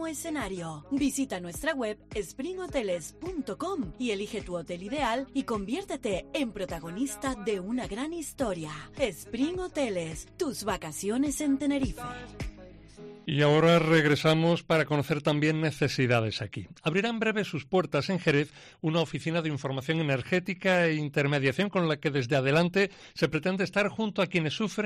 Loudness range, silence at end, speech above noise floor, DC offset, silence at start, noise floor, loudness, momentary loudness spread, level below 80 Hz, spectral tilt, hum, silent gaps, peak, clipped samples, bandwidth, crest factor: 7 LU; 0 s; 20 dB; under 0.1%; 0 s; -49 dBFS; -29 LUFS; 11 LU; -52 dBFS; -5.5 dB/octave; none; none; -10 dBFS; under 0.1%; 13.5 kHz; 18 dB